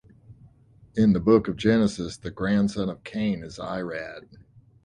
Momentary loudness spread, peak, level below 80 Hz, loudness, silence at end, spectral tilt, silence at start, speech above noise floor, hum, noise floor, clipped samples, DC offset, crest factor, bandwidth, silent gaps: 13 LU; -6 dBFS; -50 dBFS; -25 LUFS; 0.65 s; -7 dB/octave; 0.3 s; 31 dB; none; -55 dBFS; under 0.1%; under 0.1%; 20 dB; 10.5 kHz; none